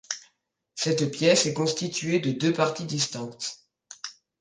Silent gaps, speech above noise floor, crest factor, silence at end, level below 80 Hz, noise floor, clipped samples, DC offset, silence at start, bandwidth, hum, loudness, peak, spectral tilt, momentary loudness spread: none; 45 dB; 20 dB; 0.3 s; -70 dBFS; -70 dBFS; under 0.1%; under 0.1%; 0.1 s; 10 kHz; none; -26 LUFS; -8 dBFS; -4 dB/octave; 18 LU